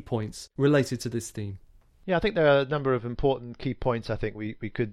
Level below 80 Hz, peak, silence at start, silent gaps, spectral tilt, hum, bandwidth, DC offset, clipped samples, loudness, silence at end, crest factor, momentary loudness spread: -46 dBFS; -10 dBFS; 0 s; none; -6 dB/octave; none; 15 kHz; under 0.1%; under 0.1%; -27 LUFS; 0 s; 18 dB; 14 LU